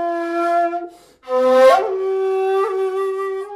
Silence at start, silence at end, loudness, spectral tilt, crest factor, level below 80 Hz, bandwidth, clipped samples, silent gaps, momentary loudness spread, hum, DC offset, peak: 0 s; 0 s; -17 LUFS; -3 dB/octave; 16 dB; -66 dBFS; 13.5 kHz; under 0.1%; none; 11 LU; none; under 0.1%; -2 dBFS